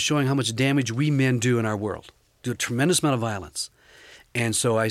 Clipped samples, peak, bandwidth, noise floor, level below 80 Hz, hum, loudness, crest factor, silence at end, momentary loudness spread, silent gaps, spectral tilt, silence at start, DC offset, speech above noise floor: under 0.1%; -10 dBFS; 15.5 kHz; -50 dBFS; -58 dBFS; none; -24 LUFS; 14 dB; 0 s; 11 LU; none; -4.5 dB/octave; 0 s; under 0.1%; 27 dB